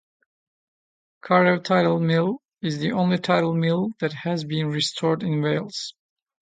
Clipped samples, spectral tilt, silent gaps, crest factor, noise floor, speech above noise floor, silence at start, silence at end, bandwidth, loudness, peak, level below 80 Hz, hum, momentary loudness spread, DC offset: under 0.1%; -6 dB/octave; none; 20 dB; under -90 dBFS; over 68 dB; 1.25 s; 0.6 s; 9.4 kHz; -23 LUFS; -4 dBFS; -66 dBFS; none; 9 LU; under 0.1%